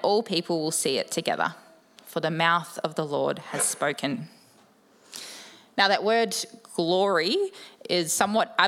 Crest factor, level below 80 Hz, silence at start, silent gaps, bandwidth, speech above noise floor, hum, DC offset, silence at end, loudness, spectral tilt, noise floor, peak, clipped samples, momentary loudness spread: 24 dB; -78 dBFS; 0 s; none; 17 kHz; 33 dB; none; under 0.1%; 0 s; -26 LUFS; -3 dB/octave; -58 dBFS; -2 dBFS; under 0.1%; 15 LU